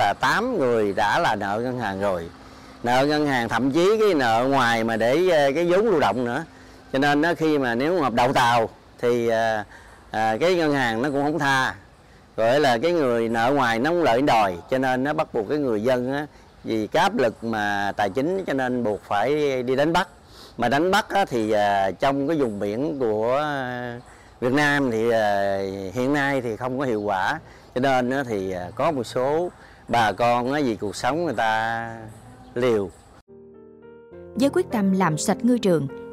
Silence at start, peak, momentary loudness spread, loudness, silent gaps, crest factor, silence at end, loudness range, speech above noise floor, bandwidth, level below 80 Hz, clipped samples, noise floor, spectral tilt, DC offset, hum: 0 s; -8 dBFS; 9 LU; -22 LUFS; 33.21-33.27 s; 16 dB; 0 s; 4 LU; 29 dB; 16 kHz; -54 dBFS; under 0.1%; -50 dBFS; -5.5 dB/octave; 0.2%; none